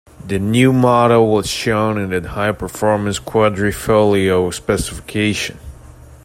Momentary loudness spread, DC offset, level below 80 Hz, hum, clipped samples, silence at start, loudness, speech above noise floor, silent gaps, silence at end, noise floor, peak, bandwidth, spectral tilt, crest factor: 9 LU; under 0.1%; -38 dBFS; none; under 0.1%; 0.25 s; -16 LUFS; 24 dB; none; 0.1 s; -39 dBFS; -2 dBFS; 16 kHz; -5.5 dB/octave; 14 dB